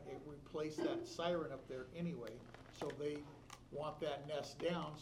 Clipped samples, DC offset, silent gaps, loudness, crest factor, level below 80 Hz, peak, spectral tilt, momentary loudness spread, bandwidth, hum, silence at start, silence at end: under 0.1%; under 0.1%; none; -45 LUFS; 18 dB; -68 dBFS; -28 dBFS; -5.5 dB/octave; 11 LU; 15.5 kHz; none; 0 s; 0 s